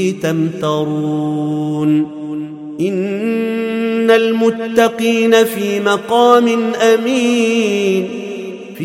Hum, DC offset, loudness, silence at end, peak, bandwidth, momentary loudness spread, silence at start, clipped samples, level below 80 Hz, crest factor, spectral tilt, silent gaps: none; under 0.1%; -15 LUFS; 0 s; 0 dBFS; 16.5 kHz; 11 LU; 0 s; under 0.1%; -62 dBFS; 14 dB; -5.5 dB/octave; none